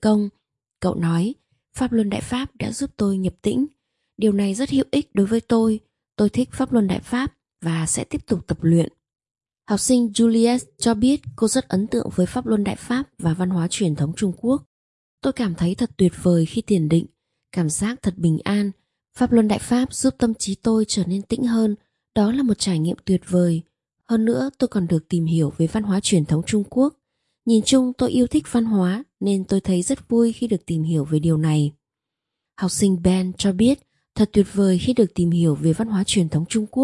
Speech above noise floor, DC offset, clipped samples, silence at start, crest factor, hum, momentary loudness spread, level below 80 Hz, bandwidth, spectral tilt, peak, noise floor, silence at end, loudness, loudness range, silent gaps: 65 dB; under 0.1%; under 0.1%; 0 s; 16 dB; none; 7 LU; -48 dBFS; 11.5 kHz; -6 dB/octave; -4 dBFS; -85 dBFS; 0 s; -21 LUFS; 3 LU; 14.66-15.18 s